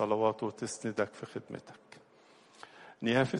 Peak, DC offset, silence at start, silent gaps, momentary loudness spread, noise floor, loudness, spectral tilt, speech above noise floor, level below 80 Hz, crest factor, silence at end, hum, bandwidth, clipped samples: -14 dBFS; under 0.1%; 0 s; none; 24 LU; -61 dBFS; -34 LUFS; -5 dB/octave; 28 dB; -72 dBFS; 20 dB; 0 s; none; 11.5 kHz; under 0.1%